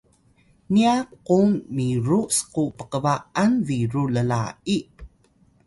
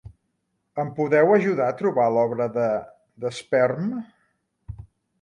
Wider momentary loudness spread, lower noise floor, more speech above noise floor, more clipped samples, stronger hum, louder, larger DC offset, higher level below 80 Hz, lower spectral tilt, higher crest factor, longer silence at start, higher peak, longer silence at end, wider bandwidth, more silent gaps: second, 7 LU vs 18 LU; second, -59 dBFS vs -74 dBFS; second, 38 dB vs 53 dB; neither; neither; about the same, -22 LUFS vs -22 LUFS; neither; about the same, -54 dBFS vs -54 dBFS; second, -5.5 dB/octave vs -7 dB/octave; about the same, 16 dB vs 18 dB; first, 0.7 s vs 0.05 s; about the same, -6 dBFS vs -6 dBFS; first, 0.6 s vs 0.35 s; about the same, 12 kHz vs 11 kHz; neither